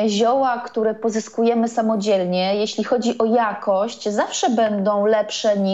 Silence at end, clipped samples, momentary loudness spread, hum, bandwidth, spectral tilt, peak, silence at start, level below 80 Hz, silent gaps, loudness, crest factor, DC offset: 0 s; under 0.1%; 4 LU; none; 8.2 kHz; -4.5 dB/octave; -6 dBFS; 0 s; -68 dBFS; none; -20 LUFS; 14 dB; 0.1%